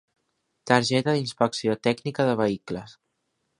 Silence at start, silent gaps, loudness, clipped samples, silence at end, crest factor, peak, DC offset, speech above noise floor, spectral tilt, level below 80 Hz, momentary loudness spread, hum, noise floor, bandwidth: 0.65 s; none; -24 LUFS; under 0.1%; 0.7 s; 24 dB; -2 dBFS; under 0.1%; 52 dB; -5 dB/octave; -64 dBFS; 13 LU; none; -76 dBFS; 11.5 kHz